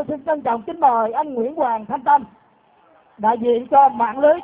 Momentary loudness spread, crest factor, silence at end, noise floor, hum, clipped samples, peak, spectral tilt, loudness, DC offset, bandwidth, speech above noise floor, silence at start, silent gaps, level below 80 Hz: 8 LU; 16 dB; 0 s; -55 dBFS; none; under 0.1%; -4 dBFS; -9 dB/octave; -18 LUFS; under 0.1%; 4 kHz; 37 dB; 0 s; none; -60 dBFS